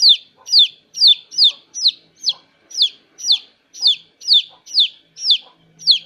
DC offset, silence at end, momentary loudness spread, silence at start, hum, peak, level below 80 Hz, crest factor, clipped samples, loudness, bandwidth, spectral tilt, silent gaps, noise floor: under 0.1%; 0.05 s; 10 LU; 0 s; none; -2 dBFS; -76 dBFS; 16 dB; under 0.1%; -14 LUFS; 15 kHz; 3.5 dB/octave; none; -41 dBFS